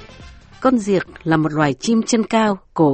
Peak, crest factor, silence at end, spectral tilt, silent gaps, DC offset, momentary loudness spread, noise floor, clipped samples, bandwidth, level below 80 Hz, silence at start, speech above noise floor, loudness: -2 dBFS; 16 dB; 0 s; -5.5 dB/octave; none; under 0.1%; 4 LU; -41 dBFS; under 0.1%; 8.8 kHz; -48 dBFS; 0 s; 24 dB; -18 LUFS